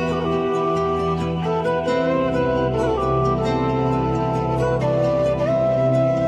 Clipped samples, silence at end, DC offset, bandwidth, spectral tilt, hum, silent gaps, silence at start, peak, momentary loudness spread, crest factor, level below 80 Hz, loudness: under 0.1%; 0 s; under 0.1%; 9 kHz; -8 dB/octave; none; none; 0 s; -8 dBFS; 3 LU; 12 dB; -38 dBFS; -20 LUFS